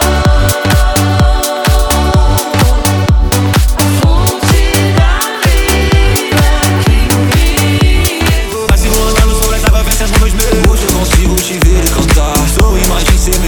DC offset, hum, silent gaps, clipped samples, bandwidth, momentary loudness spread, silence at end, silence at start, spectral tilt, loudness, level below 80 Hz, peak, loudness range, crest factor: under 0.1%; none; none; under 0.1%; over 20 kHz; 2 LU; 0 s; 0 s; -4.5 dB/octave; -10 LUFS; -12 dBFS; 0 dBFS; 1 LU; 8 dB